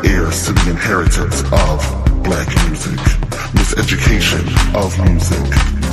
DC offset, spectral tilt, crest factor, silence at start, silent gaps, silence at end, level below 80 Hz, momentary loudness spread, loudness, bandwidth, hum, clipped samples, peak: under 0.1%; -5 dB/octave; 12 dB; 0 s; none; 0 s; -16 dBFS; 3 LU; -15 LUFS; 15.5 kHz; none; under 0.1%; 0 dBFS